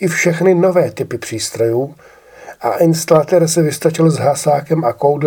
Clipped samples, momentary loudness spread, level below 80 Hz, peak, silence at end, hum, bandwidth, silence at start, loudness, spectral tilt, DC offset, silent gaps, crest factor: under 0.1%; 10 LU; -56 dBFS; 0 dBFS; 0 s; none; 18.5 kHz; 0 s; -14 LUFS; -5.5 dB/octave; under 0.1%; none; 14 dB